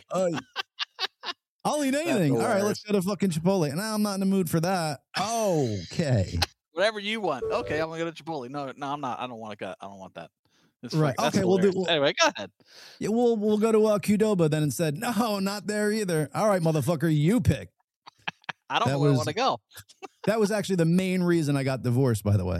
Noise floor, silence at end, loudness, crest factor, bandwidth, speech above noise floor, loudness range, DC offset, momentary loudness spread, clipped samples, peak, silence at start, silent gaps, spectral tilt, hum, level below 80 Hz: -56 dBFS; 0 s; -26 LUFS; 20 dB; 15 kHz; 30 dB; 6 LU; under 0.1%; 13 LU; under 0.1%; -6 dBFS; 0.1 s; 1.48-1.59 s, 10.39-10.44 s, 10.76-10.80 s, 17.84-17.88 s, 17.96-18.02 s; -5.5 dB/octave; none; -54 dBFS